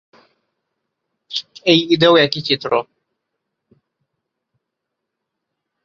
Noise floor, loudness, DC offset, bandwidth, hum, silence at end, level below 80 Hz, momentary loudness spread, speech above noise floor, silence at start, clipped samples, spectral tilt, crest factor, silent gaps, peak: -79 dBFS; -16 LUFS; under 0.1%; 7.4 kHz; none; 3.05 s; -64 dBFS; 14 LU; 65 dB; 1.3 s; under 0.1%; -5.5 dB/octave; 20 dB; none; 0 dBFS